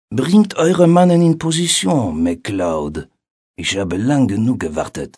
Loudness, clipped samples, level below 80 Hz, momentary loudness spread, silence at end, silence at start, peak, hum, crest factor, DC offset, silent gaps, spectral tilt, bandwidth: -15 LUFS; under 0.1%; -44 dBFS; 11 LU; 0.1 s; 0.1 s; 0 dBFS; none; 16 dB; under 0.1%; 3.31-3.54 s; -5.5 dB/octave; 11 kHz